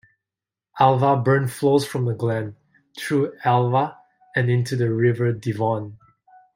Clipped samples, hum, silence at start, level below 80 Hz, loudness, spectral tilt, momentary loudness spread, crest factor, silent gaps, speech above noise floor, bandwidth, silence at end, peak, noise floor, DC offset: under 0.1%; none; 0.75 s; -64 dBFS; -21 LUFS; -7 dB/octave; 10 LU; 20 dB; none; 69 dB; 16 kHz; 0.6 s; -2 dBFS; -89 dBFS; under 0.1%